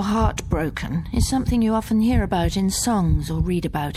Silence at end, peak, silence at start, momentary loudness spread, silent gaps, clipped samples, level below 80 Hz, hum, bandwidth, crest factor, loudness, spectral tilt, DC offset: 0 s; -6 dBFS; 0 s; 5 LU; none; under 0.1%; -28 dBFS; none; 15 kHz; 14 dB; -22 LUFS; -5.5 dB/octave; under 0.1%